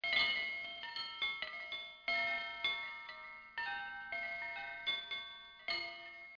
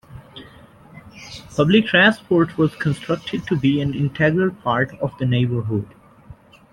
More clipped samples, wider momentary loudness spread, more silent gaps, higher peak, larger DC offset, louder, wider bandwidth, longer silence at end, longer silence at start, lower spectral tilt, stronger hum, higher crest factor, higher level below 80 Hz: neither; second, 12 LU vs 21 LU; neither; second, -20 dBFS vs -2 dBFS; neither; second, -39 LUFS vs -19 LUFS; second, 5.4 kHz vs 12 kHz; second, 0 s vs 0.4 s; about the same, 0 s vs 0.1 s; second, -1.5 dB/octave vs -7 dB/octave; neither; about the same, 22 dB vs 20 dB; second, -74 dBFS vs -50 dBFS